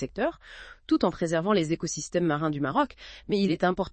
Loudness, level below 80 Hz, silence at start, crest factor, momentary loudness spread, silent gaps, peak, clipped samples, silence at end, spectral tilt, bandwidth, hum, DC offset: -27 LUFS; -54 dBFS; 0 s; 18 dB; 13 LU; none; -10 dBFS; under 0.1%; 0.05 s; -5.5 dB/octave; 8.8 kHz; none; under 0.1%